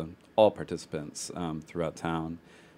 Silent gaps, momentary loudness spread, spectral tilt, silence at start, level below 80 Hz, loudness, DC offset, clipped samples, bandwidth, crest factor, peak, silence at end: none; 13 LU; -5.5 dB/octave; 0 s; -58 dBFS; -31 LUFS; under 0.1%; under 0.1%; 15.5 kHz; 24 dB; -8 dBFS; 0.4 s